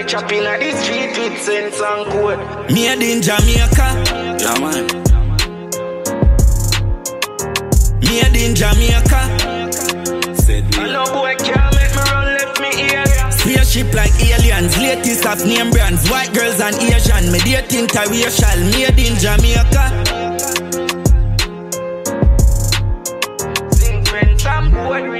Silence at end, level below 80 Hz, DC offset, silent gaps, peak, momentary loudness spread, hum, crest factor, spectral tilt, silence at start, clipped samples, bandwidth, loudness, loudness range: 0 s; -16 dBFS; under 0.1%; none; 0 dBFS; 6 LU; none; 12 dB; -4 dB/octave; 0 s; under 0.1%; 16.5 kHz; -14 LUFS; 3 LU